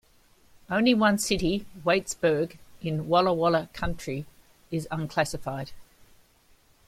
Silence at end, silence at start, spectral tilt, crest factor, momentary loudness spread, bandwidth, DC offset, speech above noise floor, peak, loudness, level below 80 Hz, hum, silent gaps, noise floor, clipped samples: 1.05 s; 0.7 s; -5 dB/octave; 20 dB; 13 LU; 16 kHz; under 0.1%; 35 dB; -8 dBFS; -27 LUFS; -48 dBFS; none; none; -60 dBFS; under 0.1%